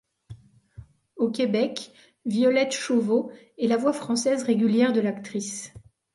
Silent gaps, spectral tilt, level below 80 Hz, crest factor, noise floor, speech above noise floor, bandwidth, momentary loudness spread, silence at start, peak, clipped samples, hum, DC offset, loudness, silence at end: none; -4.5 dB/octave; -62 dBFS; 16 dB; -48 dBFS; 25 dB; 11.5 kHz; 14 LU; 0.3 s; -10 dBFS; under 0.1%; none; under 0.1%; -24 LUFS; 0.35 s